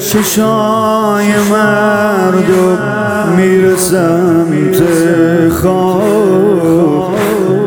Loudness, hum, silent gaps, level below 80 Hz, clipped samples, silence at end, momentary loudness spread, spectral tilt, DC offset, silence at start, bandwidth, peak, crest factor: -10 LUFS; none; none; -42 dBFS; under 0.1%; 0 s; 2 LU; -5.5 dB/octave; under 0.1%; 0 s; 19 kHz; 0 dBFS; 10 dB